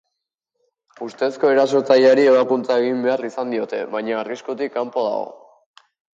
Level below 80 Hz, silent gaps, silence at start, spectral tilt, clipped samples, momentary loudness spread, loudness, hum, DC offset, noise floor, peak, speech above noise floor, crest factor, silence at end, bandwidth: -74 dBFS; none; 1 s; -5 dB/octave; under 0.1%; 13 LU; -19 LUFS; none; under 0.1%; -79 dBFS; -4 dBFS; 61 dB; 16 dB; 0.8 s; 7.8 kHz